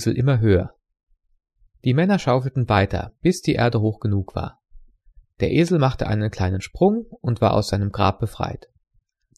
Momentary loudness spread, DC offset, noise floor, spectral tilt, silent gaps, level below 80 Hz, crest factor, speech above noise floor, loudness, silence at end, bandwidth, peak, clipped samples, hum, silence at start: 9 LU; under 0.1%; -64 dBFS; -7 dB/octave; none; -42 dBFS; 18 dB; 44 dB; -21 LUFS; 0.8 s; 13 kHz; -4 dBFS; under 0.1%; none; 0 s